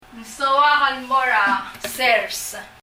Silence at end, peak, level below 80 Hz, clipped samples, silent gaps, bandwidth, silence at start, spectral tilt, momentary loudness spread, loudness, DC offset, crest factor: 0.15 s; -4 dBFS; -56 dBFS; under 0.1%; none; 16 kHz; 0.15 s; -0.5 dB/octave; 13 LU; -18 LUFS; under 0.1%; 16 dB